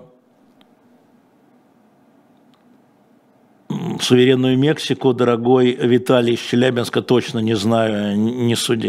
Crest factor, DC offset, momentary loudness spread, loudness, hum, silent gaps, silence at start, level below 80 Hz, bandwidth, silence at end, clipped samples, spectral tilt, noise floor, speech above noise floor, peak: 18 dB; under 0.1%; 6 LU; -17 LUFS; none; none; 3.7 s; -64 dBFS; 15 kHz; 0 s; under 0.1%; -5.5 dB/octave; -54 dBFS; 38 dB; 0 dBFS